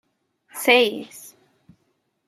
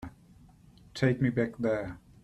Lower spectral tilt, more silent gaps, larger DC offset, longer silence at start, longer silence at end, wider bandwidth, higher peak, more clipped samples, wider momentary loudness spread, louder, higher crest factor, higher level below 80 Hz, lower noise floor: second, -1.5 dB/octave vs -7.5 dB/octave; neither; neither; first, 0.55 s vs 0 s; first, 1 s vs 0.25 s; first, 16 kHz vs 11.5 kHz; first, -2 dBFS vs -12 dBFS; neither; first, 23 LU vs 17 LU; first, -18 LUFS vs -30 LUFS; about the same, 24 dB vs 20 dB; second, -76 dBFS vs -58 dBFS; first, -70 dBFS vs -57 dBFS